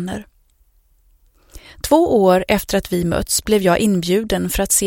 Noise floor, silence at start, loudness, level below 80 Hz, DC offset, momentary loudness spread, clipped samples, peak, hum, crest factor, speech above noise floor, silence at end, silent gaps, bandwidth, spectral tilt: -57 dBFS; 0 s; -17 LUFS; -36 dBFS; under 0.1%; 6 LU; under 0.1%; 0 dBFS; none; 18 dB; 40 dB; 0 s; none; 17 kHz; -4 dB/octave